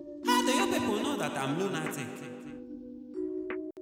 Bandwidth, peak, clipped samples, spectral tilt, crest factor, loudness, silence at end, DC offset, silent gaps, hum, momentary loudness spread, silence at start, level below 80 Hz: over 20 kHz; -14 dBFS; under 0.1%; -4 dB/octave; 18 dB; -31 LUFS; 0 s; under 0.1%; none; none; 17 LU; 0 s; -66 dBFS